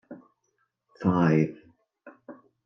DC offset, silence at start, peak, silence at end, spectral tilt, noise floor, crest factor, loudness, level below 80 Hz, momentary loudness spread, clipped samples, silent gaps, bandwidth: under 0.1%; 0.1 s; -10 dBFS; 0.3 s; -9 dB/octave; -75 dBFS; 20 dB; -25 LUFS; -68 dBFS; 26 LU; under 0.1%; none; 6.4 kHz